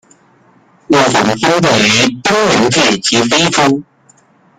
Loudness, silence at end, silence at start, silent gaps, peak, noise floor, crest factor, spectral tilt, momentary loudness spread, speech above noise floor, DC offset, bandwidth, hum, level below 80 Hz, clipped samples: -10 LUFS; 0.75 s; 0.9 s; none; 0 dBFS; -49 dBFS; 12 dB; -3.5 dB/octave; 3 LU; 38 dB; under 0.1%; 15.5 kHz; none; -48 dBFS; under 0.1%